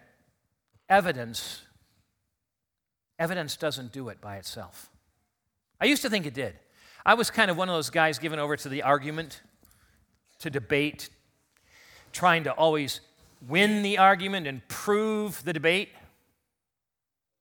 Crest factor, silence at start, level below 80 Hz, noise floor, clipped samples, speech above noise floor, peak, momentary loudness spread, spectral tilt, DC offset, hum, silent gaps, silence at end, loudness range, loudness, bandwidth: 26 dB; 0.9 s; -66 dBFS; -88 dBFS; under 0.1%; 61 dB; -4 dBFS; 17 LU; -4 dB/octave; under 0.1%; none; none; 1.55 s; 11 LU; -26 LUFS; 19.5 kHz